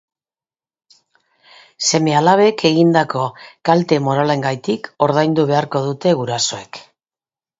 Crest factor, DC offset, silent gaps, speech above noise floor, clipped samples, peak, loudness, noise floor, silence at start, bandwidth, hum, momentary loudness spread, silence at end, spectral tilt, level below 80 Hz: 18 dB; under 0.1%; none; over 74 dB; under 0.1%; 0 dBFS; -16 LUFS; under -90 dBFS; 1.8 s; 7.8 kHz; none; 10 LU; 0.8 s; -5 dB/octave; -60 dBFS